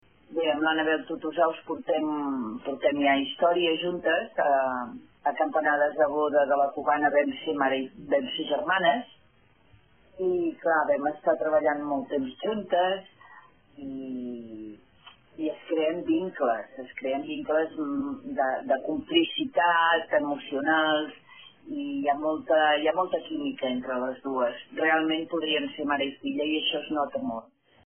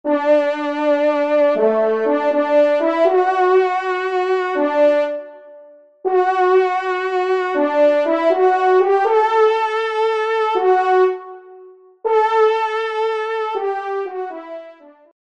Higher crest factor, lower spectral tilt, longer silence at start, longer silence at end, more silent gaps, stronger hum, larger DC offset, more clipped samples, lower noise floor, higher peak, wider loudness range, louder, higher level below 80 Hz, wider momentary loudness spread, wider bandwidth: first, 18 dB vs 12 dB; second, 1 dB/octave vs -4.5 dB/octave; first, 0.3 s vs 0.05 s; second, 0.45 s vs 0.6 s; neither; neither; second, under 0.1% vs 0.1%; neither; first, -62 dBFS vs -44 dBFS; second, -10 dBFS vs -4 dBFS; about the same, 6 LU vs 4 LU; second, -27 LUFS vs -17 LUFS; about the same, -68 dBFS vs -72 dBFS; about the same, 11 LU vs 9 LU; second, 3.5 kHz vs 8 kHz